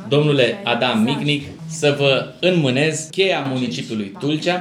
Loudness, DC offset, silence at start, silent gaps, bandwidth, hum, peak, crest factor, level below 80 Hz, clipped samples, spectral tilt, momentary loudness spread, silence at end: -18 LUFS; under 0.1%; 0 s; none; 13.5 kHz; none; -2 dBFS; 16 dB; -62 dBFS; under 0.1%; -5 dB/octave; 7 LU; 0 s